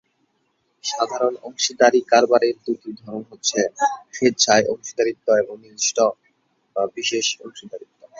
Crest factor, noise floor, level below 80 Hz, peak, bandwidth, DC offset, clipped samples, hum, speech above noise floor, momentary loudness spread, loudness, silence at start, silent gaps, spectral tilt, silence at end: 20 dB; -69 dBFS; -66 dBFS; 0 dBFS; 7.8 kHz; under 0.1%; under 0.1%; none; 48 dB; 16 LU; -20 LUFS; 0.85 s; none; -2 dB/octave; 0.4 s